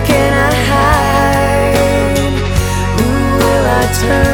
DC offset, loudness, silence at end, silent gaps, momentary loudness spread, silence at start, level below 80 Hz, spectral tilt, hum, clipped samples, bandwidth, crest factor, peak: under 0.1%; -12 LUFS; 0 s; none; 4 LU; 0 s; -20 dBFS; -5 dB/octave; none; under 0.1%; 19 kHz; 10 dB; 0 dBFS